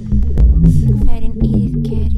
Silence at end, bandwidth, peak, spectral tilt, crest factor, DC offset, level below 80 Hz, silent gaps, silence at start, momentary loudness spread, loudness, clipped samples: 0 s; 3.7 kHz; 0 dBFS; -10 dB/octave; 10 dB; under 0.1%; -14 dBFS; none; 0 s; 7 LU; -15 LUFS; under 0.1%